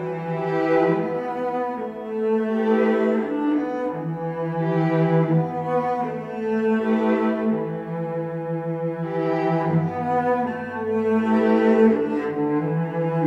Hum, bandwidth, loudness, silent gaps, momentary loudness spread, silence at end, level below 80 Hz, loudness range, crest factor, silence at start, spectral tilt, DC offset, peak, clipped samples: none; 6.4 kHz; -23 LUFS; none; 9 LU; 0 s; -64 dBFS; 3 LU; 16 dB; 0 s; -9.5 dB/octave; under 0.1%; -6 dBFS; under 0.1%